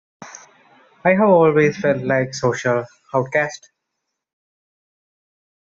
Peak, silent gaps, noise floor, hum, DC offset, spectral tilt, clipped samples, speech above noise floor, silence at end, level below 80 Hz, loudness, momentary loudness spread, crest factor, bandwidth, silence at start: -2 dBFS; none; -79 dBFS; none; under 0.1%; -6 dB/octave; under 0.1%; 62 dB; 2.05 s; -60 dBFS; -18 LUFS; 24 LU; 18 dB; 7.8 kHz; 0.2 s